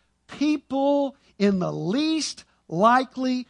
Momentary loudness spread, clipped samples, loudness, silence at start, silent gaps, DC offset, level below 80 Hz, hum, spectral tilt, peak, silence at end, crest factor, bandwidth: 11 LU; under 0.1%; -24 LUFS; 0.3 s; none; under 0.1%; -64 dBFS; none; -5 dB/octave; -4 dBFS; 0.05 s; 20 dB; 11 kHz